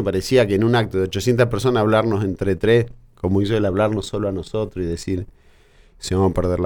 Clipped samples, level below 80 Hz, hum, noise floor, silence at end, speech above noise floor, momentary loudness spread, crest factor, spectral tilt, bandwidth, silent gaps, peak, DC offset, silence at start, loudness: under 0.1%; -40 dBFS; none; -51 dBFS; 0 s; 32 dB; 9 LU; 14 dB; -6.5 dB/octave; 18.5 kHz; none; -4 dBFS; under 0.1%; 0 s; -20 LUFS